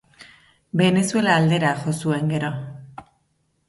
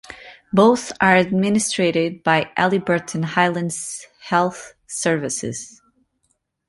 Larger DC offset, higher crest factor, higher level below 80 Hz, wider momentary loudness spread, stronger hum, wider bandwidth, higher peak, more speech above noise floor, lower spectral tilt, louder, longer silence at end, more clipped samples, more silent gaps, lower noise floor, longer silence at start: neither; about the same, 18 dB vs 18 dB; about the same, -60 dBFS vs -58 dBFS; about the same, 14 LU vs 16 LU; neither; about the same, 11.5 kHz vs 11.5 kHz; about the same, -4 dBFS vs -2 dBFS; about the same, 48 dB vs 50 dB; about the same, -5.5 dB/octave vs -4.5 dB/octave; about the same, -20 LUFS vs -19 LUFS; second, 0.65 s vs 1 s; neither; neither; about the same, -68 dBFS vs -69 dBFS; about the same, 0.2 s vs 0.1 s